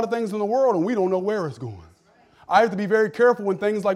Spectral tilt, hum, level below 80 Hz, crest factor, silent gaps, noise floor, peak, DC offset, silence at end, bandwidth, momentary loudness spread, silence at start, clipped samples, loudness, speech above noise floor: -6.5 dB/octave; none; -66 dBFS; 18 dB; none; -56 dBFS; -4 dBFS; under 0.1%; 0 s; 12.5 kHz; 8 LU; 0 s; under 0.1%; -21 LUFS; 35 dB